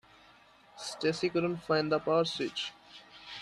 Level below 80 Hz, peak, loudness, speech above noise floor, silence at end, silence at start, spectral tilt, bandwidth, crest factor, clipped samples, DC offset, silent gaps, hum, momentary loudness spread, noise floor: -70 dBFS; -16 dBFS; -32 LUFS; 29 dB; 0 s; 0.75 s; -5 dB/octave; 12.5 kHz; 18 dB; under 0.1%; under 0.1%; none; none; 19 LU; -60 dBFS